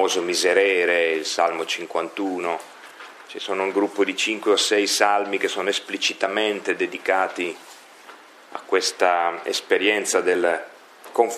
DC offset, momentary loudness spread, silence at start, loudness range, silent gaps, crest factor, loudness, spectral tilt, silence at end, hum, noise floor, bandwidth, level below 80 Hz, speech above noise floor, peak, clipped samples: under 0.1%; 13 LU; 0 s; 4 LU; none; 20 dB; -22 LUFS; -1.5 dB/octave; 0 s; none; -46 dBFS; 15 kHz; -82 dBFS; 24 dB; -2 dBFS; under 0.1%